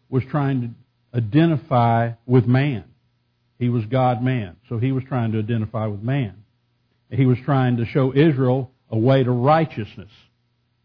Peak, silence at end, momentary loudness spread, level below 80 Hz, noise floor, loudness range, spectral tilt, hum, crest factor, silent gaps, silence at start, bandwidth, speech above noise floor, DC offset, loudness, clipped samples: -6 dBFS; 0.8 s; 10 LU; -58 dBFS; -67 dBFS; 4 LU; -11 dB/octave; 60 Hz at -40 dBFS; 16 dB; none; 0.1 s; 5.2 kHz; 48 dB; under 0.1%; -20 LUFS; under 0.1%